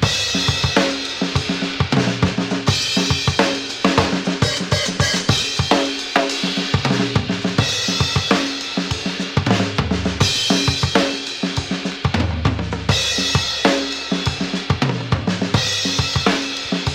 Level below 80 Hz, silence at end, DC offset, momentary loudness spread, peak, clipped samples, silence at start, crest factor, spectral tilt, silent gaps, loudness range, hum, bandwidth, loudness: -36 dBFS; 0 s; under 0.1%; 5 LU; 0 dBFS; under 0.1%; 0 s; 18 dB; -4 dB/octave; none; 1 LU; none; 16.5 kHz; -18 LUFS